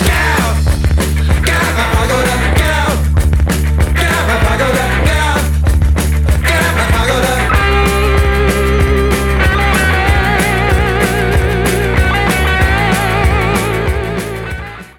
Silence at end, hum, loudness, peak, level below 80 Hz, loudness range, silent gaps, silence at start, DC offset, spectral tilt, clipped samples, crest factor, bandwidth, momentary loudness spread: 0.1 s; none; -12 LUFS; 0 dBFS; -16 dBFS; 1 LU; none; 0 s; under 0.1%; -5 dB/octave; under 0.1%; 12 dB; 18 kHz; 2 LU